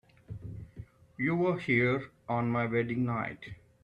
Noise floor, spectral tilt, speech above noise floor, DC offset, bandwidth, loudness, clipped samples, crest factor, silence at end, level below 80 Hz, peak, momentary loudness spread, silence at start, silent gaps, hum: -50 dBFS; -8.5 dB/octave; 20 dB; under 0.1%; 8.2 kHz; -31 LUFS; under 0.1%; 18 dB; 0.3 s; -60 dBFS; -16 dBFS; 21 LU; 0.3 s; none; none